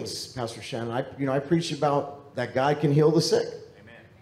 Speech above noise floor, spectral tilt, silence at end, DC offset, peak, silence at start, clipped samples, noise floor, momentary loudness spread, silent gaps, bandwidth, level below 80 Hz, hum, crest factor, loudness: 24 dB; -5.5 dB/octave; 0.2 s; under 0.1%; -10 dBFS; 0 s; under 0.1%; -50 dBFS; 13 LU; none; 14.5 kHz; -66 dBFS; none; 16 dB; -26 LUFS